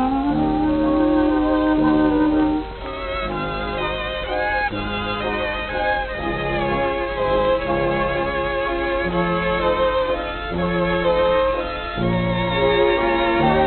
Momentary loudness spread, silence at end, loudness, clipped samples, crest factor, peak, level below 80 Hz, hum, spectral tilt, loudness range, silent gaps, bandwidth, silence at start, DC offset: 7 LU; 0 s; -20 LUFS; under 0.1%; 16 dB; -4 dBFS; -34 dBFS; none; -9.5 dB/octave; 4 LU; none; 4.4 kHz; 0 s; under 0.1%